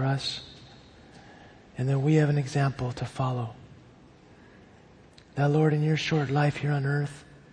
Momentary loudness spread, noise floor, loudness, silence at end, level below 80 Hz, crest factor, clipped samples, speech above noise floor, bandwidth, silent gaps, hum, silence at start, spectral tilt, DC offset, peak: 16 LU; -54 dBFS; -27 LUFS; 0.3 s; -58 dBFS; 18 dB; under 0.1%; 28 dB; 9.6 kHz; none; none; 0 s; -7 dB/octave; under 0.1%; -10 dBFS